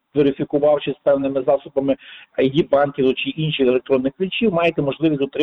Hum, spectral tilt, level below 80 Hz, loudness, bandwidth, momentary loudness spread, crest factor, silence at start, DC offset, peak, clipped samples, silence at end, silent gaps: none; -8.5 dB/octave; -54 dBFS; -19 LUFS; 5.8 kHz; 5 LU; 12 dB; 0.15 s; under 0.1%; -6 dBFS; under 0.1%; 0 s; none